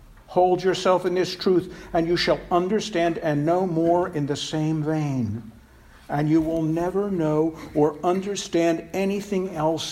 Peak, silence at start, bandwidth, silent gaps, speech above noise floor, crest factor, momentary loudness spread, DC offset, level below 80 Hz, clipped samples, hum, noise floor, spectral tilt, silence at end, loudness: -6 dBFS; 0.1 s; 14 kHz; none; 27 dB; 16 dB; 5 LU; under 0.1%; -50 dBFS; under 0.1%; none; -50 dBFS; -6 dB/octave; 0 s; -23 LUFS